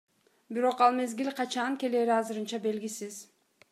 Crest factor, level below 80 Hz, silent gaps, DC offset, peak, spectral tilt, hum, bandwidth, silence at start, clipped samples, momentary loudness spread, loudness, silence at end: 20 dB; -90 dBFS; none; under 0.1%; -10 dBFS; -3.5 dB/octave; none; 15 kHz; 0.5 s; under 0.1%; 13 LU; -30 LUFS; 0.5 s